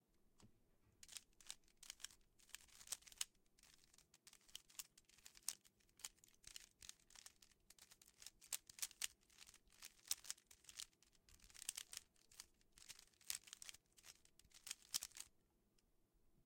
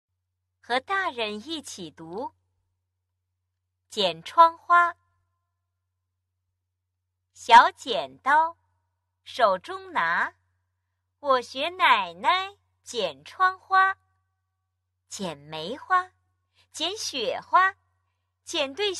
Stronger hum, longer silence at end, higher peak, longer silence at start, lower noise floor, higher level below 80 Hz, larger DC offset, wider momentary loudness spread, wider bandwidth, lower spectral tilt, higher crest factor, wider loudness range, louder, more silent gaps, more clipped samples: neither; about the same, 0.05 s vs 0 s; second, -24 dBFS vs -4 dBFS; second, 0.15 s vs 0.7 s; about the same, -81 dBFS vs -81 dBFS; second, -82 dBFS vs -70 dBFS; neither; about the same, 18 LU vs 17 LU; first, 16.5 kHz vs 12.5 kHz; second, 2 dB/octave vs -2 dB/octave; first, 36 dB vs 24 dB; second, 5 LU vs 9 LU; second, -54 LUFS vs -23 LUFS; neither; neither